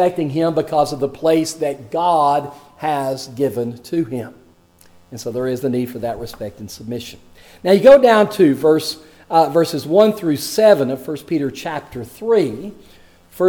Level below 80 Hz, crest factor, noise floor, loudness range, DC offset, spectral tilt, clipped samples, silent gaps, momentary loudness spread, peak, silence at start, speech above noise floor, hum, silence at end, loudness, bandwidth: -52 dBFS; 16 dB; -50 dBFS; 11 LU; under 0.1%; -5.5 dB/octave; under 0.1%; none; 17 LU; 0 dBFS; 0 s; 33 dB; none; 0 s; -17 LUFS; 19.5 kHz